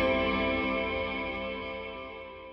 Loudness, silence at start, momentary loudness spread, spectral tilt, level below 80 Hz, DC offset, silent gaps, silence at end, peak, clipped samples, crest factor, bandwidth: -31 LUFS; 0 s; 14 LU; -7.5 dB/octave; -48 dBFS; under 0.1%; none; 0 s; -16 dBFS; under 0.1%; 16 dB; 5.8 kHz